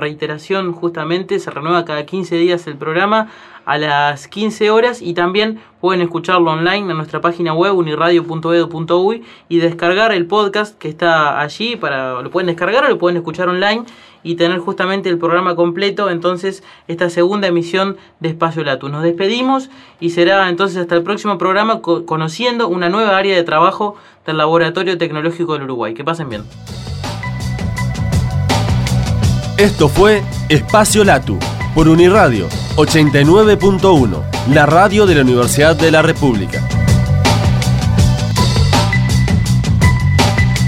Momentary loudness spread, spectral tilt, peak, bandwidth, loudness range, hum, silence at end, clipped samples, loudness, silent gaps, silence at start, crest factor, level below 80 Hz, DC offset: 10 LU; -5.5 dB/octave; 0 dBFS; 16 kHz; 7 LU; none; 0 s; under 0.1%; -14 LUFS; none; 0 s; 14 dB; -30 dBFS; under 0.1%